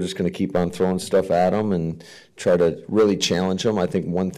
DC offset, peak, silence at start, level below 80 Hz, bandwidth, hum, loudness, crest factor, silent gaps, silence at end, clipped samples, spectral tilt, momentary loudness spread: under 0.1%; -10 dBFS; 0 s; -52 dBFS; 15 kHz; none; -21 LUFS; 10 dB; none; 0 s; under 0.1%; -5.5 dB/octave; 7 LU